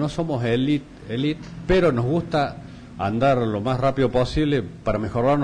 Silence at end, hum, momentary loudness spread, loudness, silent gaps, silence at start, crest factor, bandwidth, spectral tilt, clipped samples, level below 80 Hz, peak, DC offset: 0 s; none; 8 LU; -22 LUFS; none; 0 s; 12 dB; 10.5 kHz; -7.5 dB/octave; under 0.1%; -40 dBFS; -10 dBFS; under 0.1%